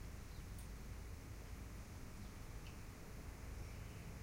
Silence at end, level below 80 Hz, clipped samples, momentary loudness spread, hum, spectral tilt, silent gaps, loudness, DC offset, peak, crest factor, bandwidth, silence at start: 0 s; -54 dBFS; under 0.1%; 2 LU; none; -5 dB/octave; none; -54 LUFS; under 0.1%; -38 dBFS; 12 dB; 16 kHz; 0 s